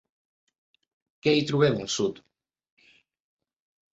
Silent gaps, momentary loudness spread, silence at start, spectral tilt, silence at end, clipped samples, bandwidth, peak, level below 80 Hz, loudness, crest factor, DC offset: none; 7 LU; 1.25 s; -5 dB/octave; 1.8 s; under 0.1%; 8 kHz; -10 dBFS; -66 dBFS; -25 LUFS; 20 dB; under 0.1%